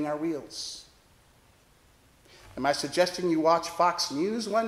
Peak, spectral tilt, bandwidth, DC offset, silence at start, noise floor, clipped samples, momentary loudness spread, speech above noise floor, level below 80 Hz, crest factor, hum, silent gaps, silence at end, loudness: -10 dBFS; -3.5 dB/octave; 15.5 kHz; under 0.1%; 0 s; -60 dBFS; under 0.1%; 13 LU; 33 dB; -64 dBFS; 18 dB; none; none; 0 s; -28 LUFS